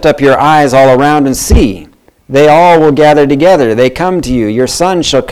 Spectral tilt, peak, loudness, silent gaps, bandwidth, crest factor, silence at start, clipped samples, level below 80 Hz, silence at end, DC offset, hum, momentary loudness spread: -5 dB/octave; 0 dBFS; -7 LUFS; none; 16 kHz; 8 dB; 0 s; 0.1%; -22 dBFS; 0 s; 1%; none; 7 LU